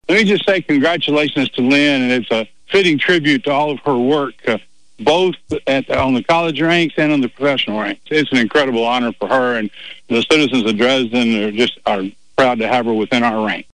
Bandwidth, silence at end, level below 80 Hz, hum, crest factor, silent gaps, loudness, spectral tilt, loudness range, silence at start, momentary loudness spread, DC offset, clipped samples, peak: 10.5 kHz; 0.15 s; -50 dBFS; none; 12 dB; none; -15 LUFS; -5 dB/octave; 2 LU; 0.1 s; 7 LU; 0.7%; under 0.1%; -4 dBFS